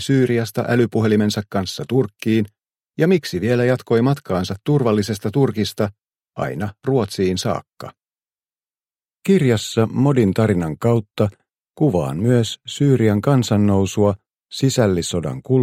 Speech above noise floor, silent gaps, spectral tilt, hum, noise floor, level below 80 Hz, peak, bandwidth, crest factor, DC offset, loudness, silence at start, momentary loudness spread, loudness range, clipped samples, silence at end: over 72 dB; none; -6.5 dB/octave; none; under -90 dBFS; -52 dBFS; -2 dBFS; 16 kHz; 16 dB; under 0.1%; -19 LUFS; 0 s; 9 LU; 4 LU; under 0.1%; 0 s